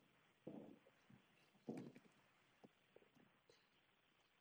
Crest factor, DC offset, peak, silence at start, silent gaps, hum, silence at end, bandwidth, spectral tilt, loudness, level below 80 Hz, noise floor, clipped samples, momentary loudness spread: 26 dB; under 0.1%; -38 dBFS; 0 s; none; none; 0 s; over 20 kHz; -6.5 dB/octave; -59 LUFS; under -90 dBFS; -80 dBFS; under 0.1%; 8 LU